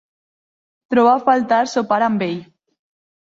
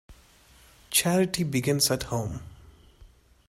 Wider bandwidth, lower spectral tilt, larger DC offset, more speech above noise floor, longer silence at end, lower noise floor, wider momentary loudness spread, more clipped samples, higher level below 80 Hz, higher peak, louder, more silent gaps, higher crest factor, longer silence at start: second, 7.8 kHz vs 16 kHz; first, -5.5 dB/octave vs -4 dB/octave; neither; first, over 74 dB vs 30 dB; first, 0.8 s vs 0.4 s; first, under -90 dBFS vs -56 dBFS; about the same, 9 LU vs 10 LU; neither; second, -64 dBFS vs -52 dBFS; first, -2 dBFS vs -8 dBFS; first, -17 LUFS vs -25 LUFS; neither; second, 16 dB vs 22 dB; first, 0.9 s vs 0.1 s